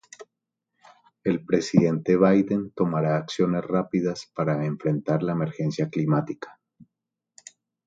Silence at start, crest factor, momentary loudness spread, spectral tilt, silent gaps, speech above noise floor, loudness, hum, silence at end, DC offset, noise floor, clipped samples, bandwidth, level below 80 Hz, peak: 0.2 s; 22 dB; 8 LU; -7.5 dB/octave; none; 61 dB; -24 LUFS; none; 1.05 s; under 0.1%; -85 dBFS; under 0.1%; 7.8 kHz; -62 dBFS; -4 dBFS